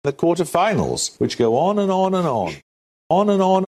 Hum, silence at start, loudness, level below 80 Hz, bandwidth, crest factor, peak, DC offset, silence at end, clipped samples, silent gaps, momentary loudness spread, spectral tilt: none; 0.05 s; -19 LUFS; -52 dBFS; 13.5 kHz; 16 dB; -2 dBFS; under 0.1%; 0.05 s; under 0.1%; 2.63-3.10 s; 5 LU; -5.5 dB/octave